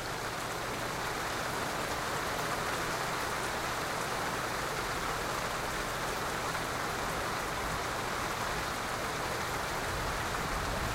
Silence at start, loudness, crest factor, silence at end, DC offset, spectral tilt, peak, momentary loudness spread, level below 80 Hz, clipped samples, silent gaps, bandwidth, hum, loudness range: 0 s; -34 LUFS; 14 dB; 0 s; under 0.1%; -3 dB/octave; -20 dBFS; 1 LU; -48 dBFS; under 0.1%; none; 16 kHz; none; 0 LU